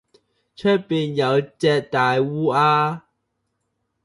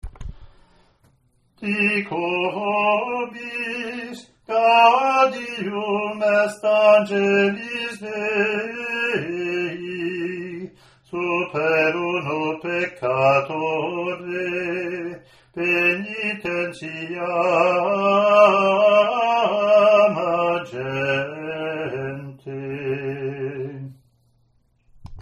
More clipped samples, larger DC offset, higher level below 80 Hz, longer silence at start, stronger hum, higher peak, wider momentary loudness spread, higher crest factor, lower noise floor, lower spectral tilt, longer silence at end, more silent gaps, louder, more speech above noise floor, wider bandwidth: neither; neither; second, -64 dBFS vs -52 dBFS; first, 0.6 s vs 0.05 s; neither; second, -6 dBFS vs -2 dBFS; second, 7 LU vs 16 LU; about the same, 16 dB vs 20 dB; first, -74 dBFS vs -63 dBFS; about the same, -6.5 dB/octave vs -5.5 dB/octave; first, 1.05 s vs 0 s; neither; about the same, -20 LUFS vs -20 LUFS; first, 55 dB vs 43 dB; about the same, 11.5 kHz vs 11 kHz